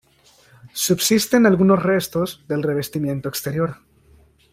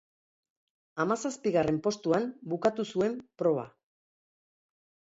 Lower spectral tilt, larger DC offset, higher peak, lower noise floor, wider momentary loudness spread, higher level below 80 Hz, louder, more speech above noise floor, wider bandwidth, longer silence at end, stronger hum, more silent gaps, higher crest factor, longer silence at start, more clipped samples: about the same, -5 dB/octave vs -6 dB/octave; neither; first, -4 dBFS vs -12 dBFS; second, -54 dBFS vs under -90 dBFS; first, 10 LU vs 6 LU; first, -54 dBFS vs -68 dBFS; first, -19 LUFS vs -30 LUFS; second, 36 dB vs over 61 dB; first, 16 kHz vs 8 kHz; second, 0.8 s vs 1.35 s; neither; neither; about the same, 16 dB vs 20 dB; second, 0.65 s vs 0.95 s; neither